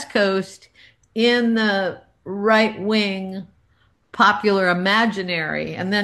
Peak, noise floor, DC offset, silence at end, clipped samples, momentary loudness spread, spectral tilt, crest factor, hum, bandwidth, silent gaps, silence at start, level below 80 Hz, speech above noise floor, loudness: -2 dBFS; -61 dBFS; under 0.1%; 0 s; under 0.1%; 15 LU; -5 dB/octave; 18 dB; none; 12.5 kHz; none; 0 s; -60 dBFS; 41 dB; -19 LUFS